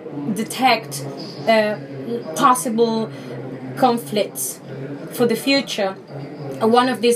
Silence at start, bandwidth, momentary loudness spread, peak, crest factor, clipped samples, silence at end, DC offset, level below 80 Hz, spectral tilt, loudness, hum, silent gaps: 0 s; 15.5 kHz; 15 LU; -2 dBFS; 18 dB; under 0.1%; 0 s; under 0.1%; -70 dBFS; -4 dB/octave; -20 LUFS; none; none